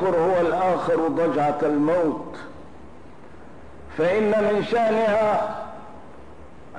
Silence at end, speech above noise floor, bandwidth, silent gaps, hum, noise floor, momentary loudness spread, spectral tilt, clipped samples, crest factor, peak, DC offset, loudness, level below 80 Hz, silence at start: 0 s; 24 dB; 10.5 kHz; none; none; -45 dBFS; 17 LU; -7 dB/octave; under 0.1%; 10 dB; -14 dBFS; 0.8%; -22 LUFS; -54 dBFS; 0 s